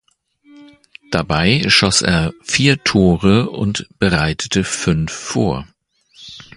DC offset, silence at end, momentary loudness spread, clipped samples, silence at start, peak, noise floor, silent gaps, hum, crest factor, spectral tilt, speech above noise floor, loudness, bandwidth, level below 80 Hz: under 0.1%; 0.15 s; 10 LU; under 0.1%; 0.55 s; 0 dBFS; -53 dBFS; none; none; 18 dB; -4.5 dB/octave; 37 dB; -15 LUFS; 11.5 kHz; -36 dBFS